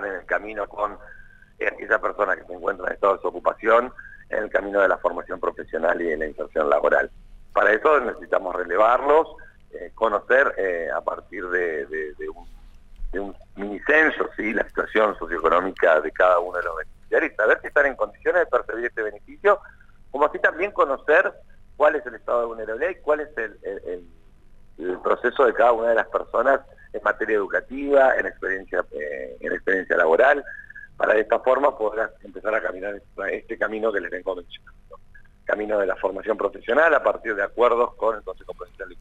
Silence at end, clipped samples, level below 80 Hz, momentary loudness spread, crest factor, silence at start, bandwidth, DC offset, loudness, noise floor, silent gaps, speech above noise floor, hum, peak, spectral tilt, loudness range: 0 s; under 0.1%; -48 dBFS; 14 LU; 18 dB; 0 s; 8 kHz; under 0.1%; -22 LUFS; -47 dBFS; none; 25 dB; none; -6 dBFS; -5.5 dB/octave; 5 LU